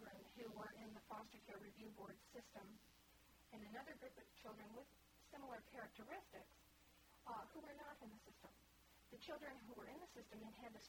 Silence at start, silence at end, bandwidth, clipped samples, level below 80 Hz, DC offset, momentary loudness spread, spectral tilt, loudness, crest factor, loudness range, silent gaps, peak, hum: 0 s; 0 s; 19.5 kHz; under 0.1%; -78 dBFS; under 0.1%; 9 LU; -4.5 dB/octave; -59 LUFS; 20 dB; 2 LU; none; -40 dBFS; none